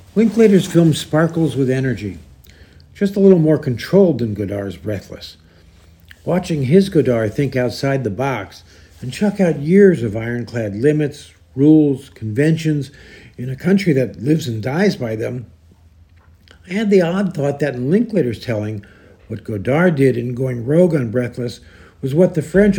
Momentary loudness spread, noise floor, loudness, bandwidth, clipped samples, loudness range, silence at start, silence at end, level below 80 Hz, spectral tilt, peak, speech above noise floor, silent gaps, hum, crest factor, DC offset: 15 LU; -48 dBFS; -17 LUFS; 17.5 kHz; under 0.1%; 4 LU; 0.15 s; 0 s; -48 dBFS; -7.5 dB/octave; 0 dBFS; 32 dB; none; none; 16 dB; under 0.1%